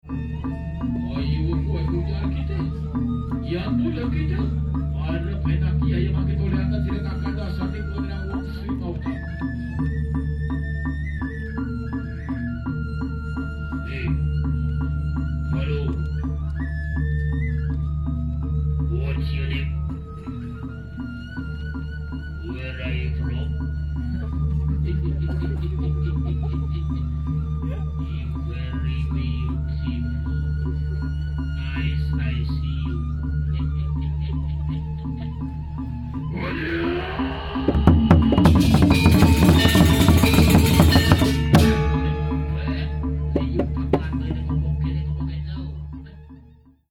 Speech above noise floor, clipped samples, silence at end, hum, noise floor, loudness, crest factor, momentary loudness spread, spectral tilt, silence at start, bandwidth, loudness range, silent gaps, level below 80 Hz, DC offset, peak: 28 dB; under 0.1%; 0.5 s; none; -50 dBFS; -23 LUFS; 20 dB; 14 LU; -6.5 dB/octave; 0.05 s; 17.5 kHz; 11 LU; none; -28 dBFS; under 0.1%; -2 dBFS